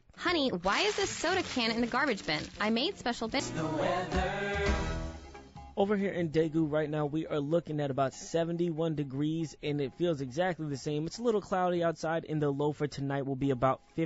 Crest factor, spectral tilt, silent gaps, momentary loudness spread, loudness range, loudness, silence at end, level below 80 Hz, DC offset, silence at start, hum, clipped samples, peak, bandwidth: 16 dB; -4 dB/octave; none; 5 LU; 2 LU; -32 LUFS; 0 s; -48 dBFS; under 0.1%; 0.15 s; none; under 0.1%; -16 dBFS; 8 kHz